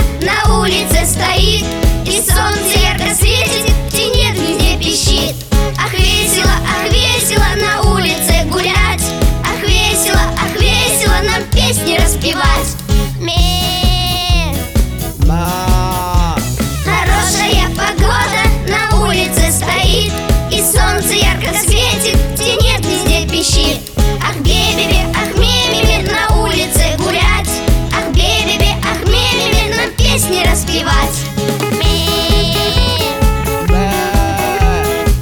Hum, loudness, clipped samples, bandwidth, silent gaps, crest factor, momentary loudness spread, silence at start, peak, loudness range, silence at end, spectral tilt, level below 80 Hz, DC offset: none; -12 LUFS; under 0.1%; 20 kHz; none; 12 dB; 4 LU; 0 s; 0 dBFS; 2 LU; 0 s; -3.5 dB/octave; -16 dBFS; under 0.1%